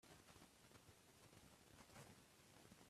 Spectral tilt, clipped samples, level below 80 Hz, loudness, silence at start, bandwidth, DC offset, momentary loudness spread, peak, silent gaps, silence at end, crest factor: -3.5 dB/octave; under 0.1%; -82 dBFS; -67 LUFS; 0 s; 14.5 kHz; under 0.1%; 4 LU; -48 dBFS; none; 0 s; 20 dB